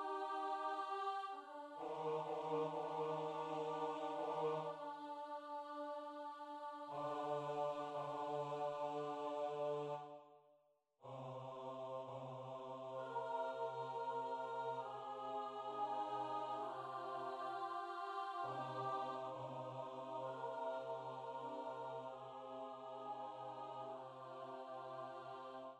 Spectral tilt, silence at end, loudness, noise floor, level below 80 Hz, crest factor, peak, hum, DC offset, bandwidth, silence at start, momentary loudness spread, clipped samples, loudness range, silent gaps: -6 dB/octave; 0 s; -46 LUFS; -77 dBFS; under -90 dBFS; 16 dB; -30 dBFS; none; under 0.1%; 11.5 kHz; 0 s; 8 LU; under 0.1%; 6 LU; none